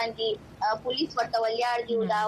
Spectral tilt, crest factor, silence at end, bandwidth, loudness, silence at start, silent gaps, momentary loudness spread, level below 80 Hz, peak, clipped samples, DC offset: -4.5 dB/octave; 14 dB; 0 s; 13 kHz; -28 LUFS; 0 s; none; 4 LU; -62 dBFS; -14 dBFS; under 0.1%; under 0.1%